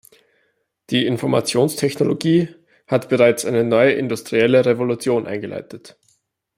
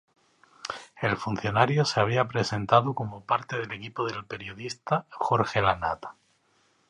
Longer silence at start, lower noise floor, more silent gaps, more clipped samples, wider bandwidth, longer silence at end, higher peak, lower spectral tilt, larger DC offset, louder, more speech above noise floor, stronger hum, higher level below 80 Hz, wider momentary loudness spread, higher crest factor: first, 0.9 s vs 0.65 s; about the same, -67 dBFS vs -67 dBFS; neither; neither; first, 16 kHz vs 11 kHz; about the same, 0.7 s vs 0.8 s; about the same, -2 dBFS vs -4 dBFS; about the same, -5.5 dB/octave vs -5.5 dB/octave; neither; first, -18 LUFS vs -27 LUFS; first, 49 dB vs 40 dB; neither; about the same, -60 dBFS vs -56 dBFS; about the same, 12 LU vs 14 LU; second, 16 dB vs 24 dB